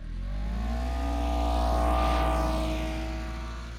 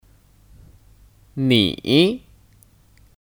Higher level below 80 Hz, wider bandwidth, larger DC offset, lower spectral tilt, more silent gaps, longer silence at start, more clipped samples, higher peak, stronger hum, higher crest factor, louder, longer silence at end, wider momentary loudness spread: first, -30 dBFS vs -52 dBFS; second, 13.5 kHz vs 18 kHz; neither; about the same, -6.5 dB/octave vs -6 dB/octave; neither; second, 0 s vs 1.35 s; neither; second, -14 dBFS vs -2 dBFS; neither; second, 14 dB vs 22 dB; second, -30 LUFS vs -18 LUFS; second, 0 s vs 1.05 s; second, 10 LU vs 16 LU